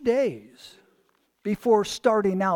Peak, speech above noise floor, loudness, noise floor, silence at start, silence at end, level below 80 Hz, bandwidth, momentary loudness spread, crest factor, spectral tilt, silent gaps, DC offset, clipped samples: -8 dBFS; 44 dB; -24 LUFS; -67 dBFS; 0 s; 0 s; -62 dBFS; 17 kHz; 12 LU; 18 dB; -5.5 dB/octave; none; under 0.1%; under 0.1%